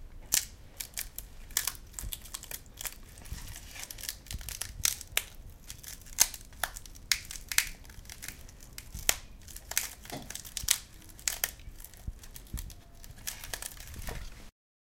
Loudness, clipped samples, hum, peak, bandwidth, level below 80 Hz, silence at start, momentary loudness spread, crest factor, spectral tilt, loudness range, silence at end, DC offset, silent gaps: -34 LUFS; under 0.1%; none; 0 dBFS; 17 kHz; -48 dBFS; 0 s; 18 LU; 36 dB; 0 dB/octave; 6 LU; 0.35 s; under 0.1%; none